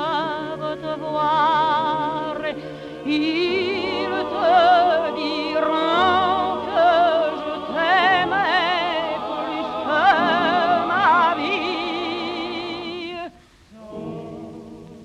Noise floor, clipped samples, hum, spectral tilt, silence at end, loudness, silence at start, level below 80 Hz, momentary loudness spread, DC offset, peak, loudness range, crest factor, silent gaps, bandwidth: -48 dBFS; under 0.1%; none; -5 dB/octave; 0 s; -20 LUFS; 0 s; -56 dBFS; 16 LU; under 0.1%; -6 dBFS; 4 LU; 16 dB; none; 9.4 kHz